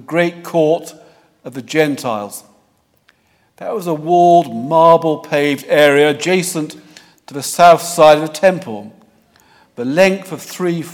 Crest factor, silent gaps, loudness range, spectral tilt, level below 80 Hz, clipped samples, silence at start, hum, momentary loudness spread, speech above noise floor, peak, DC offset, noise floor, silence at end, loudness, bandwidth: 14 dB; none; 8 LU; -4.5 dB/octave; -60 dBFS; 0.2%; 0.1 s; none; 19 LU; 45 dB; 0 dBFS; under 0.1%; -58 dBFS; 0 s; -14 LUFS; 18 kHz